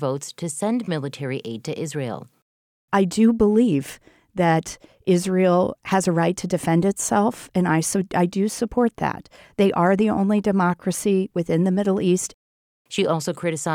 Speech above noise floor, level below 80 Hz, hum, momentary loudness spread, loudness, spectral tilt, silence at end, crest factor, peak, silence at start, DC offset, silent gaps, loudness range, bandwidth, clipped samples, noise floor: over 69 dB; -54 dBFS; none; 11 LU; -22 LUFS; -5.5 dB/octave; 0 s; 16 dB; -6 dBFS; 0 s; under 0.1%; 2.42-2.88 s, 12.34-12.85 s; 2 LU; 16 kHz; under 0.1%; under -90 dBFS